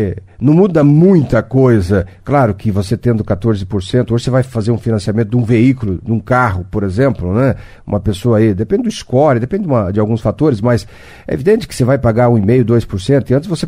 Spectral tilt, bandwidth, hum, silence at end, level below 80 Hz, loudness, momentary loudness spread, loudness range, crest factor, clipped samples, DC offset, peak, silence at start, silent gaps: -8 dB/octave; 12 kHz; none; 0 s; -36 dBFS; -13 LUFS; 7 LU; 3 LU; 12 dB; under 0.1%; under 0.1%; 0 dBFS; 0 s; none